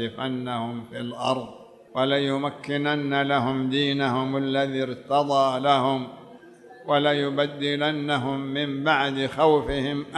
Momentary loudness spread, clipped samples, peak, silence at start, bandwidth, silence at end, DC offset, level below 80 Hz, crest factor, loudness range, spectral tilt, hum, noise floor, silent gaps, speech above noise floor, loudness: 9 LU; under 0.1%; -6 dBFS; 0 s; 11.5 kHz; 0 s; under 0.1%; -52 dBFS; 18 dB; 3 LU; -6 dB/octave; none; -47 dBFS; none; 23 dB; -24 LUFS